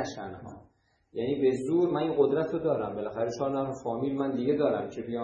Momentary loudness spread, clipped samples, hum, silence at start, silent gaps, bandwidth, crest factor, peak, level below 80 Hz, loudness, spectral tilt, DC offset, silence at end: 12 LU; under 0.1%; none; 0 s; none; 9.8 kHz; 18 dB; -12 dBFS; -64 dBFS; -29 LUFS; -7 dB/octave; under 0.1%; 0 s